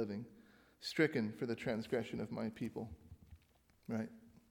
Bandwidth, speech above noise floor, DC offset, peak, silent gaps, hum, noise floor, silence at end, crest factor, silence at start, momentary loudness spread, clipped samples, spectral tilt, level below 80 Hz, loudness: 18.5 kHz; 31 dB; under 0.1%; -20 dBFS; none; none; -71 dBFS; 0.2 s; 22 dB; 0 s; 21 LU; under 0.1%; -6 dB/octave; -68 dBFS; -41 LUFS